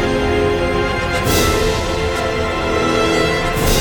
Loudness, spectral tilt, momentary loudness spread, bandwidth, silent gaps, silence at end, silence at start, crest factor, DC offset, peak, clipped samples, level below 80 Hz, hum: -16 LUFS; -4.5 dB/octave; 4 LU; over 20 kHz; none; 0 s; 0 s; 14 dB; under 0.1%; -2 dBFS; under 0.1%; -26 dBFS; none